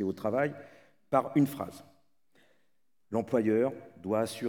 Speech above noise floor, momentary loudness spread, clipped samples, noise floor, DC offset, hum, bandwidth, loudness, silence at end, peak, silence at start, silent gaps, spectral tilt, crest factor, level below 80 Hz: 51 dB; 14 LU; under 0.1%; -81 dBFS; under 0.1%; none; 19.5 kHz; -31 LUFS; 0 s; -12 dBFS; 0 s; none; -7 dB/octave; 20 dB; -76 dBFS